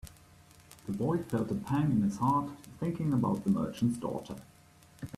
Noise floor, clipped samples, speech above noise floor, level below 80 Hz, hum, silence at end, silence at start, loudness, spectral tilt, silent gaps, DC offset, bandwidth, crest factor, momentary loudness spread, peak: -59 dBFS; under 0.1%; 28 dB; -60 dBFS; none; 0 s; 0.05 s; -32 LUFS; -8 dB/octave; none; under 0.1%; 14.5 kHz; 16 dB; 17 LU; -16 dBFS